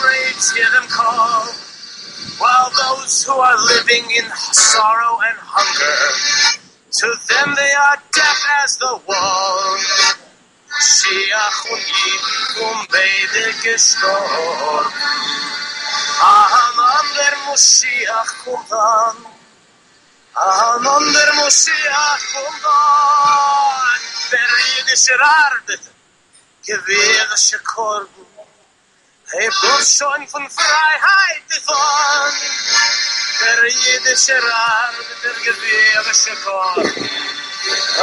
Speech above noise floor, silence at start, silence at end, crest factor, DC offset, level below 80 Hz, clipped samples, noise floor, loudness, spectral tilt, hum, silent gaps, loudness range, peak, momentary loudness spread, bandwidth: 41 dB; 0 s; 0 s; 16 dB; under 0.1%; -66 dBFS; under 0.1%; -55 dBFS; -13 LUFS; 1.5 dB/octave; none; none; 3 LU; 0 dBFS; 11 LU; 11.5 kHz